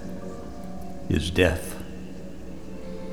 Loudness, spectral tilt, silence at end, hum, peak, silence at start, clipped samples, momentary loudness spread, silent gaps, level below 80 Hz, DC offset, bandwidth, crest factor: -28 LUFS; -5.5 dB/octave; 0 s; none; -6 dBFS; 0 s; under 0.1%; 18 LU; none; -40 dBFS; 1%; 18.5 kHz; 24 dB